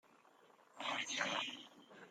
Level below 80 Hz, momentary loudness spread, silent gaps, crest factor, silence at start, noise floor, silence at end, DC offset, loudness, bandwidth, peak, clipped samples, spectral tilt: under -90 dBFS; 19 LU; none; 22 dB; 0.45 s; -68 dBFS; 0 s; under 0.1%; -41 LUFS; 16 kHz; -24 dBFS; under 0.1%; -1 dB/octave